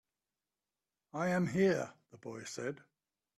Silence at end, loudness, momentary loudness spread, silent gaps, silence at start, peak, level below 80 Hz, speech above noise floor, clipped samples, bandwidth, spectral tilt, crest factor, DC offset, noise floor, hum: 0.6 s; -35 LUFS; 18 LU; none; 1.15 s; -20 dBFS; -74 dBFS; over 55 dB; under 0.1%; 12.5 kHz; -6 dB/octave; 18 dB; under 0.1%; under -90 dBFS; none